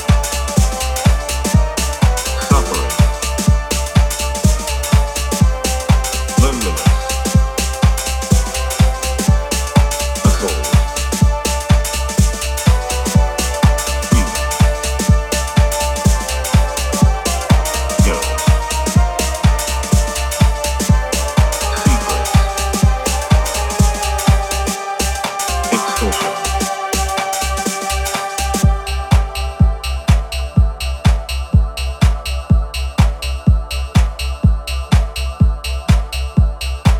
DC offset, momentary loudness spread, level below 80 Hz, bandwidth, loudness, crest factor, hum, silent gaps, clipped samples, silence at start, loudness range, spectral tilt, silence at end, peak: under 0.1%; 4 LU; -18 dBFS; 17.5 kHz; -16 LUFS; 14 dB; none; none; under 0.1%; 0 s; 2 LU; -4.5 dB/octave; 0 s; 0 dBFS